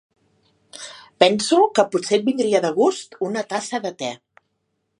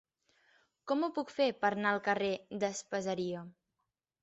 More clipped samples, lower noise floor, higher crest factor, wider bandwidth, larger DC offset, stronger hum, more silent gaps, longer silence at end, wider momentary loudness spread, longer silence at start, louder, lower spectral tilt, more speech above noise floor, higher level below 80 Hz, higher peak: neither; second, -73 dBFS vs -86 dBFS; about the same, 22 dB vs 20 dB; first, 11 kHz vs 8 kHz; neither; neither; neither; first, 0.85 s vs 0.7 s; first, 20 LU vs 9 LU; about the same, 0.75 s vs 0.85 s; first, -20 LUFS vs -34 LUFS; about the same, -3.5 dB/octave vs -3.5 dB/octave; about the same, 54 dB vs 52 dB; about the same, -72 dBFS vs -76 dBFS; first, 0 dBFS vs -16 dBFS